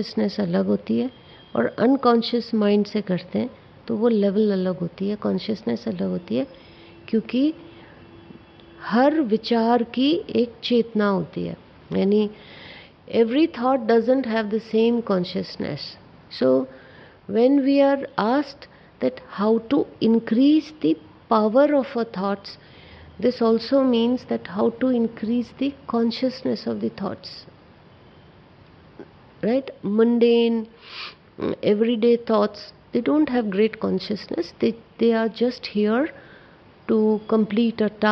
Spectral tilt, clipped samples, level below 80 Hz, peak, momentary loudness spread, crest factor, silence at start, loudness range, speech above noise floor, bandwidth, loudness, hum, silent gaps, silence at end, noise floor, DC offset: -8 dB/octave; under 0.1%; -62 dBFS; -4 dBFS; 12 LU; 18 dB; 0 s; 5 LU; 28 dB; 6.2 kHz; -22 LUFS; none; none; 0 s; -50 dBFS; under 0.1%